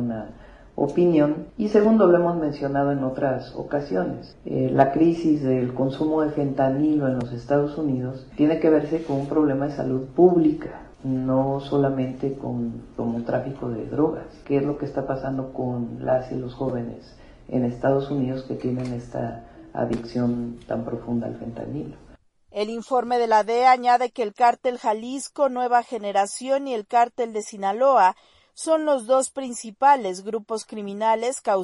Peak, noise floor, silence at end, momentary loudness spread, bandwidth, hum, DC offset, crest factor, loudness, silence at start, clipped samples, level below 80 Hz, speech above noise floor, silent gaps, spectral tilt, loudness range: -2 dBFS; -52 dBFS; 0 s; 13 LU; 11 kHz; none; under 0.1%; 20 dB; -23 LUFS; 0 s; under 0.1%; -52 dBFS; 30 dB; none; -6.5 dB/octave; 6 LU